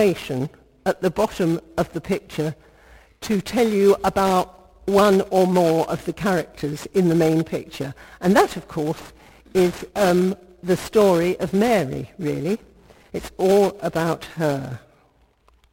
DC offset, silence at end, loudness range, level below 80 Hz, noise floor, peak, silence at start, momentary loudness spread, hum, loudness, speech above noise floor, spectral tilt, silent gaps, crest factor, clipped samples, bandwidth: under 0.1%; 0.95 s; 5 LU; -50 dBFS; -59 dBFS; -2 dBFS; 0 s; 12 LU; none; -21 LUFS; 39 dB; -6 dB/octave; none; 18 dB; under 0.1%; 17 kHz